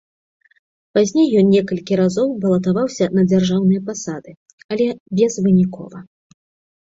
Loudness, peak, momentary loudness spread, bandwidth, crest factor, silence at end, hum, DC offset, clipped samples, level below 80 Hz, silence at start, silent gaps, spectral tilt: -17 LUFS; -4 dBFS; 13 LU; 7.8 kHz; 14 dB; 0.8 s; none; under 0.1%; under 0.1%; -56 dBFS; 0.95 s; 4.37-4.46 s, 4.53-4.58 s, 4.64-4.69 s, 5.00-5.06 s; -7 dB/octave